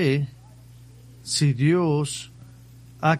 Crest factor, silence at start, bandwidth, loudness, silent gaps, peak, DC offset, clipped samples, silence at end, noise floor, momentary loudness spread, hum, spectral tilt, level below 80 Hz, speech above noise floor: 18 dB; 0 s; 14.5 kHz; -23 LUFS; none; -6 dBFS; under 0.1%; under 0.1%; 0 s; -47 dBFS; 16 LU; none; -5.5 dB/octave; -56 dBFS; 25 dB